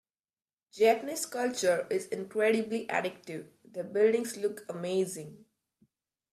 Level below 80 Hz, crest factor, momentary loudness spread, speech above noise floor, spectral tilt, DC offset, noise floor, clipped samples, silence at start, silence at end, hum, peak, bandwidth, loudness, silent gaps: -80 dBFS; 20 dB; 16 LU; over 60 dB; -4 dB/octave; under 0.1%; under -90 dBFS; under 0.1%; 0.75 s; 0.95 s; none; -12 dBFS; 14.5 kHz; -30 LUFS; none